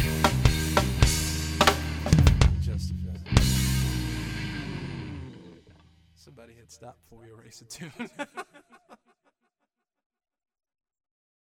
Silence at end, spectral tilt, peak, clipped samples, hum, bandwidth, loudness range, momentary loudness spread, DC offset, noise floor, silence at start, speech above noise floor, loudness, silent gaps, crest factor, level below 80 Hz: 2.6 s; -4.5 dB/octave; 0 dBFS; under 0.1%; none; 17 kHz; 20 LU; 19 LU; under 0.1%; -82 dBFS; 0 s; 40 dB; -25 LUFS; none; 28 dB; -32 dBFS